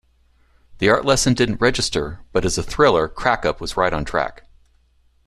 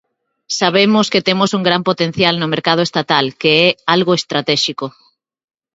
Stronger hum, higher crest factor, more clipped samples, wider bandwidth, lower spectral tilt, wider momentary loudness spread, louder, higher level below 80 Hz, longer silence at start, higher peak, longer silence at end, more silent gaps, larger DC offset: neither; about the same, 18 dB vs 16 dB; neither; first, 13.5 kHz vs 8 kHz; about the same, -4 dB/octave vs -4.5 dB/octave; about the same, 7 LU vs 5 LU; second, -19 LUFS vs -14 LUFS; first, -38 dBFS vs -58 dBFS; first, 0.7 s vs 0.5 s; about the same, -2 dBFS vs 0 dBFS; about the same, 0.9 s vs 0.85 s; neither; neither